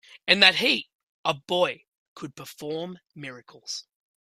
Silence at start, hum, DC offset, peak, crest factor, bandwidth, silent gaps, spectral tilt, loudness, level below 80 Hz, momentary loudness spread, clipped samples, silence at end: 0.25 s; none; under 0.1%; 0 dBFS; 26 dB; 15.5 kHz; 0.94-1.24 s, 1.88-2.16 s; -2.5 dB/octave; -22 LUFS; -72 dBFS; 24 LU; under 0.1%; 0.4 s